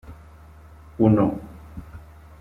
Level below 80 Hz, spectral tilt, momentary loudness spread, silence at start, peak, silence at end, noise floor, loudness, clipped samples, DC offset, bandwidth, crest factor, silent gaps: -46 dBFS; -10.5 dB/octave; 26 LU; 0.1 s; -4 dBFS; 0.4 s; -46 dBFS; -20 LUFS; under 0.1%; under 0.1%; 4.1 kHz; 22 dB; none